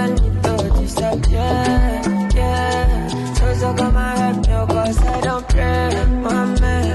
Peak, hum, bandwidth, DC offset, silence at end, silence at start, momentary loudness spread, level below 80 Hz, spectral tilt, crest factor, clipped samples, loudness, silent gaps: -6 dBFS; none; 12 kHz; under 0.1%; 0 s; 0 s; 2 LU; -18 dBFS; -6 dB/octave; 10 dB; under 0.1%; -18 LUFS; none